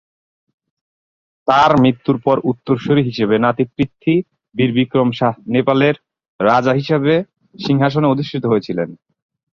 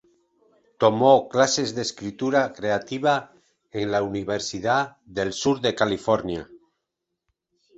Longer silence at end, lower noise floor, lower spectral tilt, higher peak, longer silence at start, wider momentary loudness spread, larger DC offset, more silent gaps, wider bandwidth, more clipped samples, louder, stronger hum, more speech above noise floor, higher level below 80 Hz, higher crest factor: second, 0.6 s vs 1.2 s; first, under -90 dBFS vs -82 dBFS; first, -8 dB/octave vs -4 dB/octave; first, 0 dBFS vs -4 dBFS; first, 1.45 s vs 0.8 s; second, 8 LU vs 11 LU; neither; first, 6.28-6.39 s vs none; second, 7.2 kHz vs 8.2 kHz; neither; first, -16 LUFS vs -23 LUFS; neither; first, over 75 dB vs 59 dB; first, -52 dBFS vs -58 dBFS; about the same, 16 dB vs 20 dB